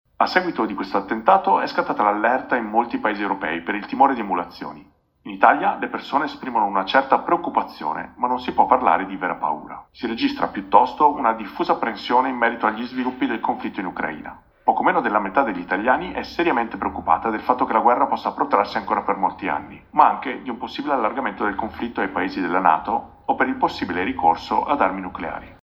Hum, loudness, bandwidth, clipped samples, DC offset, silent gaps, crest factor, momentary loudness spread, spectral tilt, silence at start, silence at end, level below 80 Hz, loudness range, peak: none; -21 LUFS; 7.2 kHz; under 0.1%; under 0.1%; none; 22 dB; 10 LU; -6.5 dB/octave; 0.2 s; 0.1 s; -54 dBFS; 2 LU; 0 dBFS